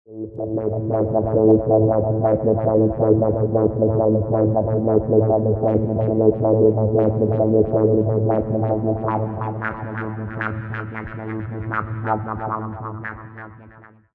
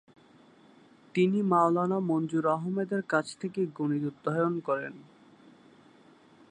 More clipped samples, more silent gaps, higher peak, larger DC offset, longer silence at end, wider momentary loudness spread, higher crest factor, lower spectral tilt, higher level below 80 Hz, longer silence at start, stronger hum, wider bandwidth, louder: neither; neither; first, -4 dBFS vs -10 dBFS; neither; second, 0.45 s vs 1.5 s; first, 13 LU vs 8 LU; about the same, 16 dB vs 20 dB; first, -13 dB/octave vs -7.5 dB/octave; first, -44 dBFS vs -80 dBFS; second, 0.1 s vs 1.15 s; neither; second, 3.3 kHz vs 10 kHz; first, -20 LUFS vs -29 LUFS